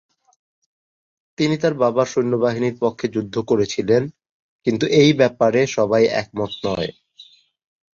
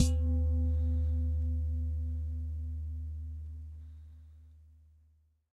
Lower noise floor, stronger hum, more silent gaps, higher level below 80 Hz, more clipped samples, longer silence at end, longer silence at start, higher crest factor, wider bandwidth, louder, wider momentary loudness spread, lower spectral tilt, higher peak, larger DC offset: second, -49 dBFS vs -67 dBFS; neither; first, 4.29-4.59 s vs none; second, -56 dBFS vs -34 dBFS; neither; second, 0.7 s vs 0.9 s; first, 1.4 s vs 0 s; about the same, 18 dB vs 20 dB; second, 7.6 kHz vs 11 kHz; first, -19 LUFS vs -34 LUFS; second, 10 LU vs 19 LU; second, -5.5 dB/octave vs -7 dB/octave; first, -2 dBFS vs -12 dBFS; neither